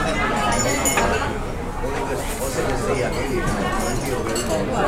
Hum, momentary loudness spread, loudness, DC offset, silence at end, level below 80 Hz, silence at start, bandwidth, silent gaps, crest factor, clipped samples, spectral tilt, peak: none; 7 LU; -22 LUFS; under 0.1%; 0 s; -30 dBFS; 0 s; 16 kHz; none; 18 dB; under 0.1%; -4 dB/octave; -4 dBFS